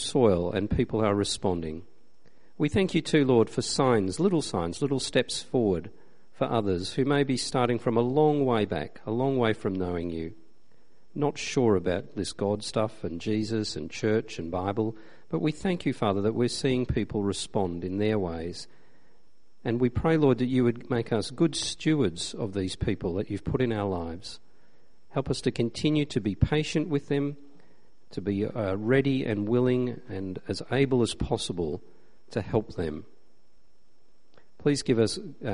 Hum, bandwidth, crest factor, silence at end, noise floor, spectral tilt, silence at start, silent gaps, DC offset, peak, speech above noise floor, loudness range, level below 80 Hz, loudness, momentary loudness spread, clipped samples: none; 10.5 kHz; 20 dB; 0 s; -69 dBFS; -6 dB/octave; 0 s; none; 0.7%; -8 dBFS; 42 dB; 4 LU; -50 dBFS; -28 LUFS; 10 LU; under 0.1%